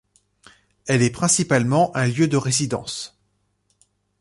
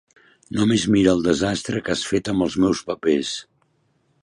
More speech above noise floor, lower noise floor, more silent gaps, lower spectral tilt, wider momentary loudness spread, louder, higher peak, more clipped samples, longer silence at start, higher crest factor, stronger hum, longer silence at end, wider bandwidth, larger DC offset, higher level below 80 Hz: first, 49 dB vs 45 dB; first, -69 dBFS vs -65 dBFS; neither; about the same, -4.5 dB/octave vs -5 dB/octave; first, 13 LU vs 8 LU; about the same, -20 LUFS vs -21 LUFS; about the same, -6 dBFS vs -4 dBFS; neither; first, 0.85 s vs 0.5 s; about the same, 16 dB vs 18 dB; first, 50 Hz at -55 dBFS vs none; first, 1.15 s vs 0.8 s; about the same, 11.5 kHz vs 11.5 kHz; neither; second, -56 dBFS vs -48 dBFS